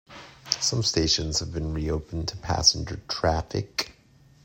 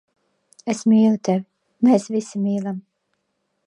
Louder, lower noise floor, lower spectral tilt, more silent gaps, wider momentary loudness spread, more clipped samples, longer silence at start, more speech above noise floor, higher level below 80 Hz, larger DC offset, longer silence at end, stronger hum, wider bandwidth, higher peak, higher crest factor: second, -25 LUFS vs -20 LUFS; second, -56 dBFS vs -73 dBFS; second, -3.5 dB/octave vs -7 dB/octave; neither; about the same, 12 LU vs 13 LU; neither; second, 0.1 s vs 0.65 s; second, 30 dB vs 54 dB; first, -42 dBFS vs -74 dBFS; neither; second, 0.55 s vs 0.85 s; neither; first, 16.5 kHz vs 10.5 kHz; first, 0 dBFS vs -4 dBFS; first, 26 dB vs 18 dB